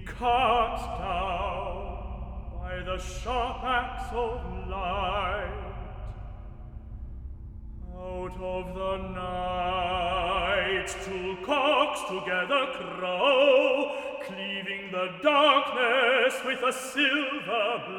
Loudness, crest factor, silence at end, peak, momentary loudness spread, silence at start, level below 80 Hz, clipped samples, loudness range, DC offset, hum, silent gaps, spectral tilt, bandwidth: -27 LUFS; 20 dB; 0 s; -8 dBFS; 19 LU; 0 s; -42 dBFS; under 0.1%; 11 LU; under 0.1%; none; none; -4 dB/octave; 17 kHz